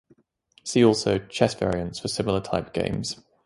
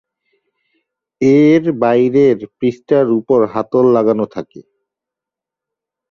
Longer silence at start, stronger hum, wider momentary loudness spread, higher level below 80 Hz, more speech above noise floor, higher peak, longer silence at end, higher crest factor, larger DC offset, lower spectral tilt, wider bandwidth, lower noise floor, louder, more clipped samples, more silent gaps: second, 0.65 s vs 1.2 s; neither; about the same, 10 LU vs 9 LU; first, -48 dBFS vs -56 dBFS; second, 38 dB vs 73 dB; about the same, -4 dBFS vs -2 dBFS; second, 0.3 s vs 1.5 s; first, 20 dB vs 14 dB; neither; second, -5 dB/octave vs -8.5 dB/octave; first, 11.5 kHz vs 7 kHz; second, -62 dBFS vs -85 dBFS; second, -25 LUFS vs -13 LUFS; neither; neither